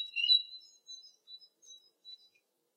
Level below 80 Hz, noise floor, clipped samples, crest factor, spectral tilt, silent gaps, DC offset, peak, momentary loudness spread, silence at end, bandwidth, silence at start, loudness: under -90 dBFS; -74 dBFS; under 0.1%; 22 dB; 6 dB/octave; none; under 0.1%; -16 dBFS; 26 LU; 0.6 s; 15.5 kHz; 0 s; -26 LUFS